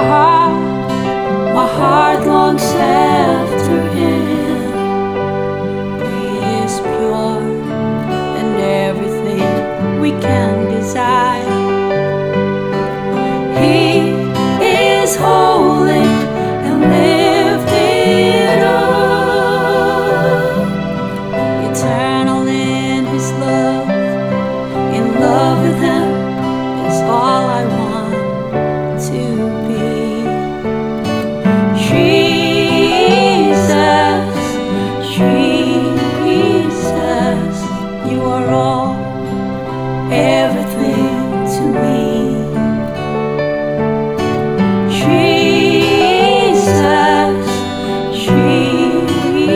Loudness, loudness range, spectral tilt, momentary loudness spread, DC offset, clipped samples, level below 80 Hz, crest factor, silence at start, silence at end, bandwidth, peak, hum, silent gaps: -13 LUFS; 5 LU; -5.5 dB/octave; 8 LU; under 0.1%; under 0.1%; -42 dBFS; 12 dB; 0 s; 0 s; 19 kHz; 0 dBFS; none; none